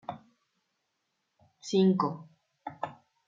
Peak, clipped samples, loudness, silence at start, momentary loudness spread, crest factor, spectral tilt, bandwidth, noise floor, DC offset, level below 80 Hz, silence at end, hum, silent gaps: -14 dBFS; under 0.1%; -29 LUFS; 0.1 s; 21 LU; 18 dB; -7 dB/octave; 7.6 kHz; -81 dBFS; under 0.1%; -78 dBFS; 0.35 s; none; none